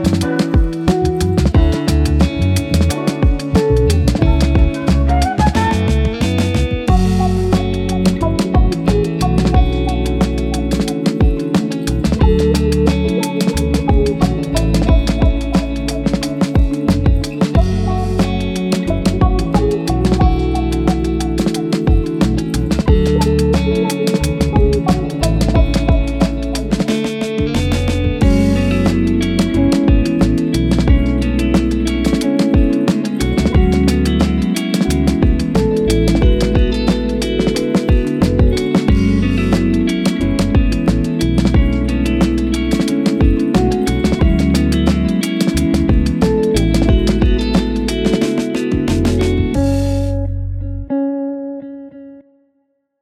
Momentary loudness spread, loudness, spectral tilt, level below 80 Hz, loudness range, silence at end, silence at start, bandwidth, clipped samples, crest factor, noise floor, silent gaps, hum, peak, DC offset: 4 LU; -15 LUFS; -7 dB/octave; -18 dBFS; 2 LU; 0.8 s; 0 s; 14.5 kHz; under 0.1%; 14 dB; -64 dBFS; none; none; 0 dBFS; under 0.1%